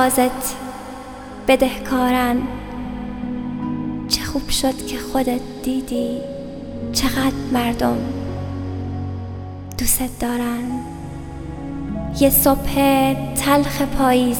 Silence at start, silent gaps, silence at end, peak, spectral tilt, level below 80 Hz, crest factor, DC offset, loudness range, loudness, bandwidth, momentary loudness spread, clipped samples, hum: 0 s; none; 0 s; 0 dBFS; -4.5 dB/octave; -34 dBFS; 20 dB; under 0.1%; 6 LU; -20 LUFS; 19.5 kHz; 15 LU; under 0.1%; none